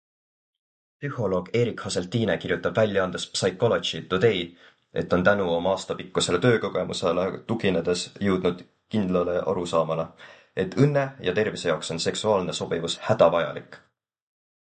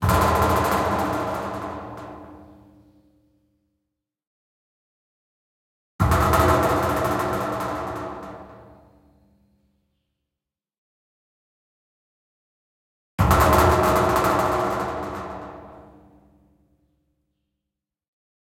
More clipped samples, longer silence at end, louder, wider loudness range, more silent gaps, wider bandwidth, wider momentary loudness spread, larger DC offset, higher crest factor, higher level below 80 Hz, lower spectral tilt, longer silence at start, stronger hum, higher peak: neither; second, 1 s vs 2.6 s; second, -25 LUFS vs -21 LUFS; second, 2 LU vs 18 LU; second, none vs 4.27-5.99 s, 10.78-13.18 s; second, 9.4 kHz vs 16.5 kHz; second, 8 LU vs 20 LU; neither; about the same, 20 dB vs 24 dB; second, -54 dBFS vs -38 dBFS; about the same, -5 dB/octave vs -5.5 dB/octave; first, 1 s vs 0 s; neither; about the same, -4 dBFS vs -2 dBFS